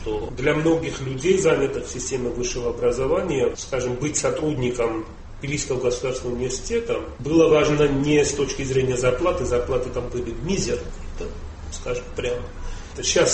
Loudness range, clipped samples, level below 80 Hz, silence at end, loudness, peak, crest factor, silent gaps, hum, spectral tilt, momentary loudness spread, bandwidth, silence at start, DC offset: 6 LU; under 0.1%; -36 dBFS; 0 s; -23 LUFS; -4 dBFS; 18 dB; none; none; -4.5 dB/octave; 13 LU; 8.8 kHz; 0 s; under 0.1%